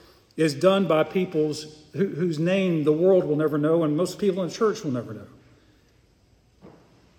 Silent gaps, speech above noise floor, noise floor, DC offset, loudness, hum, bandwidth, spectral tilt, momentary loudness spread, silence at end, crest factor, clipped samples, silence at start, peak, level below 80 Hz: none; 37 dB; -60 dBFS; under 0.1%; -23 LUFS; none; 16 kHz; -6.5 dB/octave; 12 LU; 0.5 s; 18 dB; under 0.1%; 0.35 s; -6 dBFS; -66 dBFS